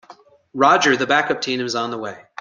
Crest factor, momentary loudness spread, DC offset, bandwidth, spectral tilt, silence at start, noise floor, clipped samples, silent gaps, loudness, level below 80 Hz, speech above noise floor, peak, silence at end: 18 dB; 16 LU; under 0.1%; 9.6 kHz; -3 dB/octave; 0.1 s; -47 dBFS; under 0.1%; none; -18 LUFS; -64 dBFS; 29 dB; -2 dBFS; 0.2 s